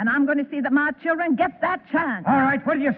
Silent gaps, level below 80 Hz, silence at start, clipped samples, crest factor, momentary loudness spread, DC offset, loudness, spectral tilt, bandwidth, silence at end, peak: none; -60 dBFS; 0 s; under 0.1%; 12 dB; 4 LU; under 0.1%; -22 LUFS; -10 dB/octave; 4.3 kHz; 0 s; -8 dBFS